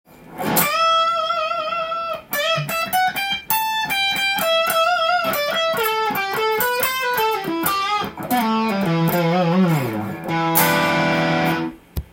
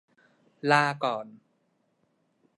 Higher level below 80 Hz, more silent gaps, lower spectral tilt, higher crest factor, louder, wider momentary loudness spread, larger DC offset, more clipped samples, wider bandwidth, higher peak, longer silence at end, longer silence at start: first, -48 dBFS vs -80 dBFS; neither; about the same, -4 dB/octave vs -5 dB/octave; second, 18 dB vs 24 dB; first, -19 LUFS vs -26 LUFS; second, 7 LU vs 15 LU; neither; neither; first, 17 kHz vs 11 kHz; first, -2 dBFS vs -8 dBFS; second, 0.05 s vs 1.2 s; second, 0.2 s vs 0.65 s